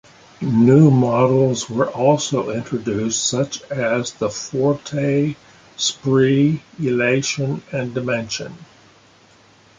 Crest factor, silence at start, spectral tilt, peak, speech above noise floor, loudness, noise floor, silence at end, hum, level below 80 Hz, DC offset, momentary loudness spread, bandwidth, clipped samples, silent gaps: 16 dB; 0.4 s; -5.5 dB/octave; -2 dBFS; 33 dB; -19 LUFS; -51 dBFS; 1.15 s; none; -56 dBFS; under 0.1%; 11 LU; 9.6 kHz; under 0.1%; none